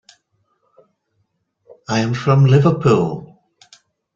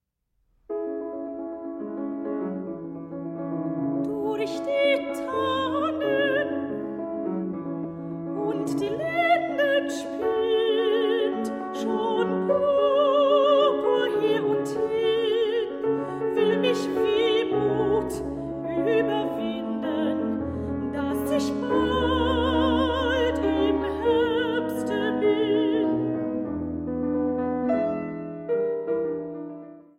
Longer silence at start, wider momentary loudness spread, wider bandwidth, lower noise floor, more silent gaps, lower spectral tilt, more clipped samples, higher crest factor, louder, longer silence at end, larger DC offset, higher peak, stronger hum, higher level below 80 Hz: first, 1.9 s vs 0.7 s; first, 15 LU vs 10 LU; second, 7.6 kHz vs 15.5 kHz; second, -68 dBFS vs -72 dBFS; neither; first, -7.5 dB/octave vs -6 dB/octave; neither; about the same, 16 dB vs 16 dB; first, -15 LUFS vs -25 LUFS; first, 0.9 s vs 0.15 s; neither; first, -2 dBFS vs -10 dBFS; neither; about the same, -52 dBFS vs -48 dBFS